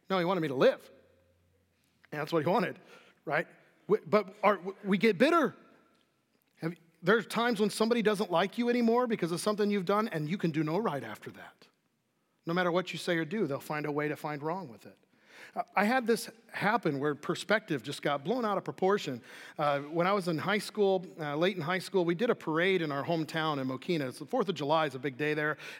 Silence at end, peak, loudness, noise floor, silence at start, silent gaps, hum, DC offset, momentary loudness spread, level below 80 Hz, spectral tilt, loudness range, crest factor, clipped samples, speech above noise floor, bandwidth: 0 s; -12 dBFS; -31 LUFS; -76 dBFS; 0.1 s; none; none; under 0.1%; 12 LU; -88 dBFS; -5.5 dB/octave; 4 LU; 20 dB; under 0.1%; 46 dB; 17 kHz